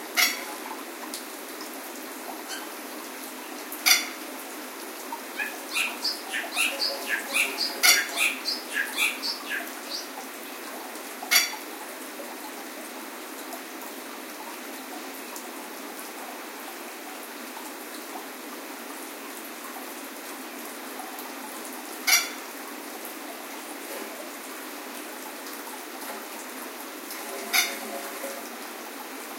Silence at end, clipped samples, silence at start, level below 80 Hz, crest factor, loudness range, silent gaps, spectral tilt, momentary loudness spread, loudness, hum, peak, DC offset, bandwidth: 0 s; under 0.1%; 0 s; under -90 dBFS; 28 dB; 13 LU; none; 1.5 dB/octave; 15 LU; -29 LUFS; none; -2 dBFS; under 0.1%; 17 kHz